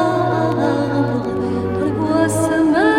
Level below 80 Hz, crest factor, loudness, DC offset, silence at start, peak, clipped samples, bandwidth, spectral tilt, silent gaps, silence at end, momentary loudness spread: -46 dBFS; 14 dB; -18 LUFS; under 0.1%; 0 s; -2 dBFS; under 0.1%; 14.5 kHz; -6.5 dB/octave; none; 0 s; 5 LU